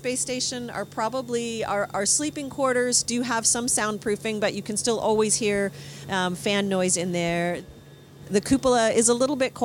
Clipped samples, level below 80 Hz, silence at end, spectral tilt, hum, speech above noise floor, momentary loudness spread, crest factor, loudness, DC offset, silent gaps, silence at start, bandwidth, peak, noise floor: under 0.1%; -56 dBFS; 0 s; -3 dB/octave; none; 22 dB; 8 LU; 16 dB; -24 LUFS; under 0.1%; none; 0 s; 18 kHz; -8 dBFS; -46 dBFS